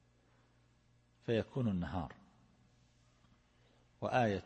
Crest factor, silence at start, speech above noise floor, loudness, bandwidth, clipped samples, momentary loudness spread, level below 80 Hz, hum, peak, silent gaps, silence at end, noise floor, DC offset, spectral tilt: 20 dB; 1.3 s; 35 dB; -38 LUFS; 8.4 kHz; under 0.1%; 13 LU; -64 dBFS; 60 Hz at -65 dBFS; -20 dBFS; none; 0 s; -71 dBFS; under 0.1%; -7.5 dB/octave